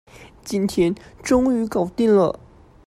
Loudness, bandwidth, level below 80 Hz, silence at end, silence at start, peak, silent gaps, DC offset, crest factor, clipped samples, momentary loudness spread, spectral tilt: -20 LUFS; 14 kHz; -46 dBFS; 0.55 s; 0.2 s; -6 dBFS; none; under 0.1%; 16 dB; under 0.1%; 13 LU; -6 dB/octave